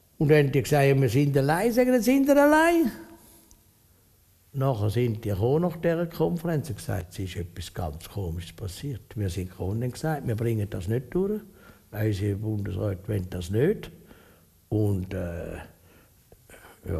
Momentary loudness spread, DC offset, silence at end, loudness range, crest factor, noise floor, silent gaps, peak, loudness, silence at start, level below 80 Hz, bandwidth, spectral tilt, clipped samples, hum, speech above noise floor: 15 LU; under 0.1%; 0 s; 10 LU; 18 dB; -60 dBFS; none; -8 dBFS; -26 LUFS; 0.2 s; -48 dBFS; 15.5 kHz; -7 dB/octave; under 0.1%; none; 35 dB